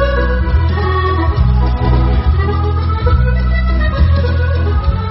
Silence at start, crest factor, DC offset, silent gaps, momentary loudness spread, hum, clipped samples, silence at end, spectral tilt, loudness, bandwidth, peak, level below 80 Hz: 0 s; 12 dB; under 0.1%; none; 2 LU; none; under 0.1%; 0 s; -11 dB/octave; -14 LUFS; 5.8 kHz; 0 dBFS; -14 dBFS